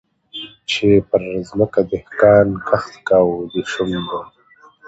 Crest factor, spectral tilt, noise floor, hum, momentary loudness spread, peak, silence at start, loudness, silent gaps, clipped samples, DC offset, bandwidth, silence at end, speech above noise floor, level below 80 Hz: 18 dB; -6 dB/octave; -48 dBFS; none; 16 LU; 0 dBFS; 0.35 s; -17 LUFS; none; under 0.1%; under 0.1%; 8 kHz; 0.6 s; 32 dB; -46 dBFS